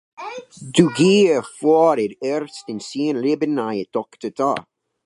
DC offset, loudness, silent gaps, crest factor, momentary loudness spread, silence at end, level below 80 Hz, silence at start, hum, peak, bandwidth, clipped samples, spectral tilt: under 0.1%; -19 LUFS; none; 20 dB; 16 LU; 0.45 s; -64 dBFS; 0.2 s; none; 0 dBFS; 11.5 kHz; under 0.1%; -5.5 dB/octave